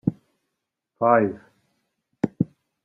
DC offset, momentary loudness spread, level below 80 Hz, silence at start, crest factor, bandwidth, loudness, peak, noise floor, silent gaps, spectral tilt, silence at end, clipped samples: under 0.1%; 10 LU; -64 dBFS; 0.05 s; 22 dB; 7.4 kHz; -24 LUFS; -4 dBFS; -81 dBFS; none; -10 dB/octave; 0.4 s; under 0.1%